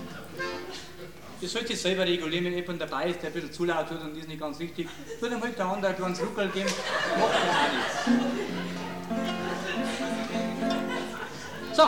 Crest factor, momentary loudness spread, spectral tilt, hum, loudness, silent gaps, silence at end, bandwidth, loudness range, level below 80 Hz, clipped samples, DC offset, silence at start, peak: 24 dB; 12 LU; -4 dB/octave; none; -30 LUFS; none; 0 s; 19 kHz; 5 LU; -60 dBFS; under 0.1%; 0.4%; 0 s; -6 dBFS